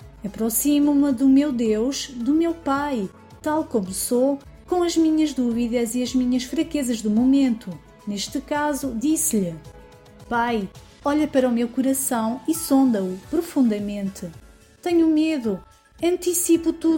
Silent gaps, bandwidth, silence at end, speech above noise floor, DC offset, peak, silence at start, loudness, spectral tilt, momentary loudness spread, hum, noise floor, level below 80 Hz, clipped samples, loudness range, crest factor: none; 17 kHz; 0 s; 25 dB; under 0.1%; -8 dBFS; 0 s; -22 LUFS; -4.5 dB/octave; 11 LU; none; -46 dBFS; -50 dBFS; under 0.1%; 3 LU; 14 dB